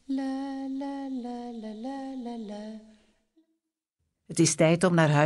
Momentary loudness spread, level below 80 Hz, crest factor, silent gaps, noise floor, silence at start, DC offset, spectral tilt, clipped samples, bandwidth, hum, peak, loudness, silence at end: 17 LU; -68 dBFS; 20 dB; none; -82 dBFS; 0.1 s; under 0.1%; -5 dB/octave; under 0.1%; 12 kHz; none; -10 dBFS; -28 LUFS; 0 s